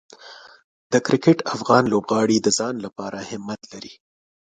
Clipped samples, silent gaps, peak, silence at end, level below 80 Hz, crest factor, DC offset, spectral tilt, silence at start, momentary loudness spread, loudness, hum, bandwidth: under 0.1%; 0.64-0.90 s; -2 dBFS; 0.5 s; -62 dBFS; 20 dB; under 0.1%; -4.5 dB/octave; 0.25 s; 21 LU; -20 LUFS; none; 9.6 kHz